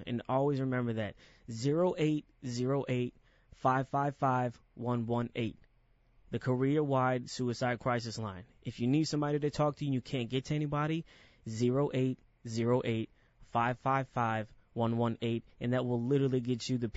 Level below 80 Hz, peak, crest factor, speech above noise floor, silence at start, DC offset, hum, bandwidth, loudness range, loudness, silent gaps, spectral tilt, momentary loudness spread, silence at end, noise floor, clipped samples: -64 dBFS; -16 dBFS; 16 dB; 35 dB; 0 s; under 0.1%; none; 7.6 kHz; 1 LU; -33 LUFS; none; -6.5 dB/octave; 10 LU; 0.05 s; -68 dBFS; under 0.1%